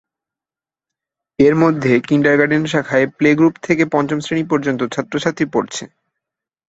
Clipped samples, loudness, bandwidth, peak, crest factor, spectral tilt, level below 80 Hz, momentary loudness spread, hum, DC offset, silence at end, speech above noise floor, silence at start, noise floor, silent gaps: under 0.1%; -16 LUFS; 8 kHz; -2 dBFS; 16 dB; -6 dB/octave; -54 dBFS; 8 LU; none; under 0.1%; 0.85 s; over 75 dB; 1.4 s; under -90 dBFS; none